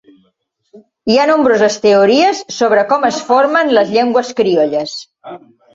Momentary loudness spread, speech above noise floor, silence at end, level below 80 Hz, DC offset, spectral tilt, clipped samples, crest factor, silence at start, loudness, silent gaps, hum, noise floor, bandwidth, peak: 12 LU; 50 dB; 0.4 s; -58 dBFS; under 0.1%; -4 dB/octave; under 0.1%; 12 dB; 0.75 s; -12 LUFS; none; none; -62 dBFS; 7.8 kHz; 0 dBFS